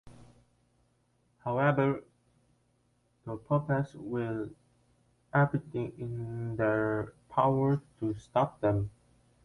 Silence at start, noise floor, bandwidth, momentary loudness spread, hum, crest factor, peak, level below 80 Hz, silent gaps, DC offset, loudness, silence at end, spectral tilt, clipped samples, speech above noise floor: 0.05 s; -72 dBFS; 10.5 kHz; 12 LU; 60 Hz at -60 dBFS; 20 dB; -14 dBFS; -60 dBFS; none; under 0.1%; -31 LUFS; 0.55 s; -9 dB/octave; under 0.1%; 41 dB